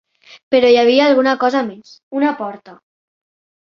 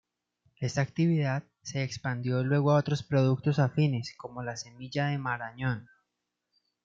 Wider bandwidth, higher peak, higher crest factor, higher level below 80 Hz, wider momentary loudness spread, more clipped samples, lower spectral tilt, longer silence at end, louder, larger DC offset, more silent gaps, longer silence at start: about the same, 7 kHz vs 7.6 kHz; first, 0 dBFS vs -14 dBFS; about the same, 16 dB vs 16 dB; about the same, -62 dBFS vs -66 dBFS; first, 16 LU vs 12 LU; neither; second, -4.5 dB/octave vs -6.5 dB/octave; about the same, 0.95 s vs 1 s; first, -14 LUFS vs -30 LUFS; neither; first, 2.03-2.11 s vs none; about the same, 0.5 s vs 0.6 s